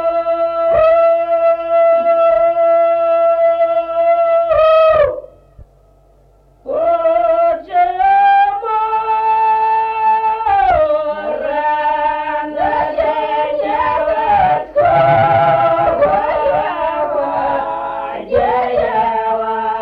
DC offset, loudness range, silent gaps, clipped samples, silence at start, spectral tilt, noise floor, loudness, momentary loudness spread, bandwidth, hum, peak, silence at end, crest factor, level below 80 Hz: under 0.1%; 4 LU; none; under 0.1%; 0 s; -7.5 dB/octave; -49 dBFS; -14 LUFS; 7 LU; 5.2 kHz; none; -2 dBFS; 0 s; 10 dB; -42 dBFS